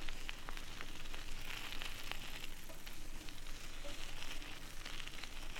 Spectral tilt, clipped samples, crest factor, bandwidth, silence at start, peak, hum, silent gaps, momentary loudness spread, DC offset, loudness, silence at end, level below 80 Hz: -2 dB/octave; under 0.1%; 20 dB; 17 kHz; 0 s; -20 dBFS; none; none; 6 LU; under 0.1%; -48 LUFS; 0 s; -46 dBFS